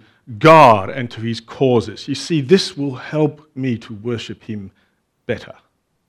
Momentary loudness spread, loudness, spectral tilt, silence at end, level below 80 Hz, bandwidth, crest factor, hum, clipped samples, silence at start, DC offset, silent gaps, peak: 20 LU; -16 LUFS; -6 dB/octave; 0.65 s; -56 dBFS; 15 kHz; 18 dB; none; 0.1%; 0.3 s; under 0.1%; none; 0 dBFS